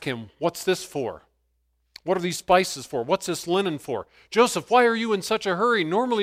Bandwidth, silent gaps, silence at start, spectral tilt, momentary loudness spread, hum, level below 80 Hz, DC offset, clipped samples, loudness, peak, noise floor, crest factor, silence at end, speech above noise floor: 16 kHz; none; 0 s; -4 dB/octave; 12 LU; none; -62 dBFS; under 0.1%; under 0.1%; -24 LUFS; -4 dBFS; -71 dBFS; 20 dB; 0 s; 47 dB